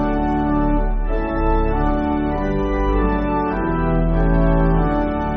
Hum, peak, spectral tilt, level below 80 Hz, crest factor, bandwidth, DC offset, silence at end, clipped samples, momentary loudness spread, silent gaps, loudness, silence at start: none; -4 dBFS; -7.5 dB/octave; -22 dBFS; 14 dB; 4.7 kHz; under 0.1%; 0 s; under 0.1%; 4 LU; none; -20 LUFS; 0 s